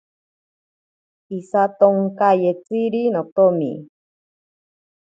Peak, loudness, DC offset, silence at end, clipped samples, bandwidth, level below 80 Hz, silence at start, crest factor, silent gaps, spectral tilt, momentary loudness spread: -2 dBFS; -18 LUFS; under 0.1%; 1.25 s; under 0.1%; 7.8 kHz; -72 dBFS; 1.3 s; 20 dB; 3.32-3.36 s; -8.5 dB/octave; 13 LU